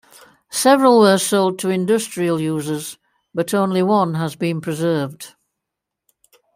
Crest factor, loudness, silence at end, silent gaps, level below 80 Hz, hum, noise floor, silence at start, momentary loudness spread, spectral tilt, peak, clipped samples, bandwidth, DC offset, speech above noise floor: 18 dB; -18 LUFS; 1.25 s; none; -66 dBFS; none; -82 dBFS; 0.5 s; 15 LU; -5 dB/octave; -2 dBFS; under 0.1%; 16 kHz; under 0.1%; 65 dB